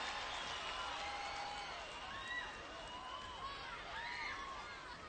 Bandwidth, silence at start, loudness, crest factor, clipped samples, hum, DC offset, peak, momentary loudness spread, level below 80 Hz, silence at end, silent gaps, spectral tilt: 8.8 kHz; 0 s; -45 LUFS; 16 dB; under 0.1%; none; under 0.1%; -30 dBFS; 5 LU; -64 dBFS; 0 s; none; -2 dB/octave